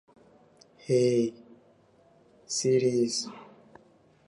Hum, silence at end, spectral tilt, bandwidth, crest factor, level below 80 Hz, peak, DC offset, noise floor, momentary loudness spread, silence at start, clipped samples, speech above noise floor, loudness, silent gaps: none; 0.85 s; -5 dB/octave; 11.5 kHz; 16 dB; -74 dBFS; -14 dBFS; under 0.1%; -61 dBFS; 17 LU; 0.9 s; under 0.1%; 35 dB; -27 LUFS; none